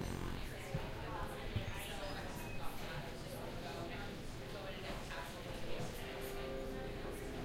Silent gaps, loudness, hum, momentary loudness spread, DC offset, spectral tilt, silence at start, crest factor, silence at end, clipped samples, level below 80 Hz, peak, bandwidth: none; -46 LUFS; none; 3 LU; under 0.1%; -5 dB/octave; 0 s; 16 dB; 0 s; under 0.1%; -50 dBFS; -26 dBFS; 16 kHz